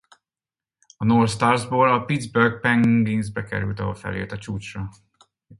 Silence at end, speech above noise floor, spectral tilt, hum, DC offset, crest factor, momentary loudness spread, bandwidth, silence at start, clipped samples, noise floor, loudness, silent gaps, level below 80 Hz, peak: 0.05 s; over 69 dB; -6.5 dB/octave; none; under 0.1%; 20 dB; 13 LU; 11.5 kHz; 1 s; under 0.1%; under -90 dBFS; -21 LUFS; none; -50 dBFS; -2 dBFS